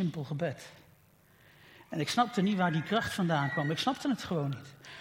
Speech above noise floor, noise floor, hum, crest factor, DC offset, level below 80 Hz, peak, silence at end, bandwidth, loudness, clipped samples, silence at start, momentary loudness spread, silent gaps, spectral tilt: 31 dB; -63 dBFS; none; 18 dB; under 0.1%; -68 dBFS; -14 dBFS; 0 s; 16.5 kHz; -31 LUFS; under 0.1%; 0 s; 13 LU; none; -5.5 dB/octave